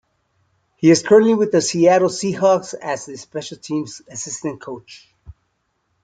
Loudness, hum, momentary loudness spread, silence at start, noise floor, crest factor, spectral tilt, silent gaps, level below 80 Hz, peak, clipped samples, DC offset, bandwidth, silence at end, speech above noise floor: -17 LUFS; none; 17 LU; 0.8 s; -69 dBFS; 18 dB; -5 dB/octave; none; -58 dBFS; -2 dBFS; under 0.1%; under 0.1%; 9.4 kHz; 0.75 s; 52 dB